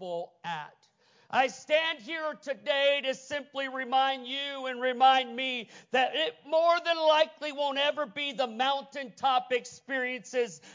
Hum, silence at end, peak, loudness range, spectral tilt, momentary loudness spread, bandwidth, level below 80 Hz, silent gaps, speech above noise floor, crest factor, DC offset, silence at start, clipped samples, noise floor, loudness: none; 0.05 s; -12 dBFS; 3 LU; -2.5 dB/octave; 11 LU; 7.6 kHz; -84 dBFS; none; 36 dB; 18 dB; under 0.1%; 0 s; under 0.1%; -65 dBFS; -29 LUFS